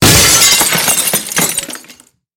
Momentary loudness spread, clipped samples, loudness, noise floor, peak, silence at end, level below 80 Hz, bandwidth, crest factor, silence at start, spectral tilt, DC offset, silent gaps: 16 LU; under 0.1%; -8 LUFS; -42 dBFS; 0 dBFS; 0.45 s; -32 dBFS; over 20 kHz; 12 dB; 0 s; -1.5 dB/octave; under 0.1%; none